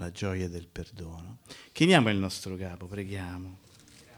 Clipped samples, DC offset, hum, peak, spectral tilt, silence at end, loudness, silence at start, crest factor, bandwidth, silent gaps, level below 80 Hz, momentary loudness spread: under 0.1%; under 0.1%; none; -8 dBFS; -5.5 dB/octave; 0 s; -29 LUFS; 0 s; 24 dB; 19.5 kHz; none; -54 dBFS; 23 LU